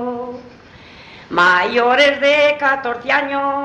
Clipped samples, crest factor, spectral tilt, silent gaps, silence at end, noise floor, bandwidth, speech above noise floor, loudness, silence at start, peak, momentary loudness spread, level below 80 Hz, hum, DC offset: under 0.1%; 16 dB; -3.5 dB/octave; none; 0 s; -41 dBFS; 9.2 kHz; 26 dB; -14 LUFS; 0 s; 0 dBFS; 14 LU; -56 dBFS; none; under 0.1%